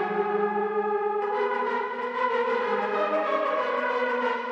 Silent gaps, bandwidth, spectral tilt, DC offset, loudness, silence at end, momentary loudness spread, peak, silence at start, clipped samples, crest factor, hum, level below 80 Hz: none; 7.4 kHz; -5.5 dB/octave; under 0.1%; -26 LUFS; 0 s; 2 LU; -14 dBFS; 0 s; under 0.1%; 12 dB; none; -82 dBFS